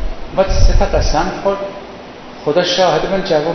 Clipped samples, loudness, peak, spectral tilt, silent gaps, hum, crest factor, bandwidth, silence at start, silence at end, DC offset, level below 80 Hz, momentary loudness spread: 0.2%; -16 LUFS; 0 dBFS; -5 dB/octave; none; none; 14 dB; 6.4 kHz; 0 s; 0 s; under 0.1%; -18 dBFS; 18 LU